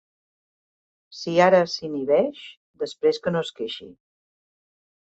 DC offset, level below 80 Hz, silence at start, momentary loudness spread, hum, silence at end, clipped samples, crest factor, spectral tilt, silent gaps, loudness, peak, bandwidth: under 0.1%; -68 dBFS; 1.1 s; 20 LU; none; 1.2 s; under 0.1%; 20 dB; -5.5 dB/octave; 2.57-2.74 s; -23 LUFS; -6 dBFS; 8.2 kHz